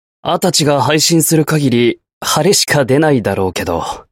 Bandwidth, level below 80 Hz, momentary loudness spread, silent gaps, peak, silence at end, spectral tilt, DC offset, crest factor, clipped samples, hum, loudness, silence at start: 16.5 kHz; -44 dBFS; 8 LU; 2.13-2.21 s; 0 dBFS; 0.1 s; -4 dB/octave; under 0.1%; 14 dB; under 0.1%; none; -13 LUFS; 0.25 s